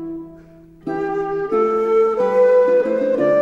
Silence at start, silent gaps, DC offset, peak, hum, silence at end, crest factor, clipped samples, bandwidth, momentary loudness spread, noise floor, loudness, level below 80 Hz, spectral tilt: 0 s; none; under 0.1%; -6 dBFS; none; 0 s; 12 dB; under 0.1%; 7 kHz; 15 LU; -44 dBFS; -17 LUFS; -54 dBFS; -7.5 dB/octave